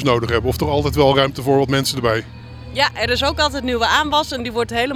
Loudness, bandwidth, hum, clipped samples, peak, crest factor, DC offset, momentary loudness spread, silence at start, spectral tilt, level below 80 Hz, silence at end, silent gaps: -18 LUFS; 17 kHz; none; under 0.1%; 0 dBFS; 18 dB; under 0.1%; 8 LU; 0 s; -4.5 dB/octave; -34 dBFS; 0 s; none